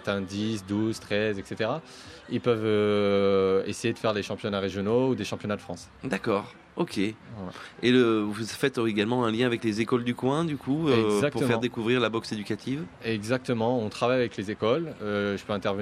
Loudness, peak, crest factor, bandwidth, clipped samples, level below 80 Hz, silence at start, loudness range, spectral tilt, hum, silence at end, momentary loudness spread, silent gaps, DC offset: -27 LUFS; -10 dBFS; 18 dB; 14 kHz; under 0.1%; -62 dBFS; 0 s; 3 LU; -6 dB/octave; none; 0 s; 9 LU; none; under 0.1%